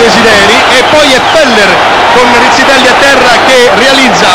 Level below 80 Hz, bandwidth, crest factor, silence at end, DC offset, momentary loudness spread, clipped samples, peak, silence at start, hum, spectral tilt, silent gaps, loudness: -32 dBFS; over 20 kHz; 4 dB; 0 s; 2%; 1 LU; 10%; 0 dBFS; 0 s; none; -2.5 dB/octave; none; -3 LUFS